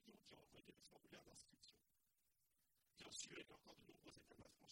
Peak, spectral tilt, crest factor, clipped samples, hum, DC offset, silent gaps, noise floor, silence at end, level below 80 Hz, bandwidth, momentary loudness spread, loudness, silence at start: -40 dBFS; -2 dB/octave; 26 dB; under 0.1%; none; under 0.1%; none; -88 dBFS; 0 s; -86 dBFS; 16.5 kHz; 13 LU; -62 LUFS; 0 s